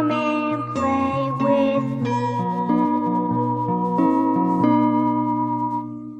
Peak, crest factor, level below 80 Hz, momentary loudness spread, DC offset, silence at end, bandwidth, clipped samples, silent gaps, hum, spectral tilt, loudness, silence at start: -6 dBFS; 14 dB; -60 dBFS; 5 LU; under 0.1%; 0 s; 8.2 kHz; under 0.1%; none; none; -8 dB/octave; -21 LUFS; 0 s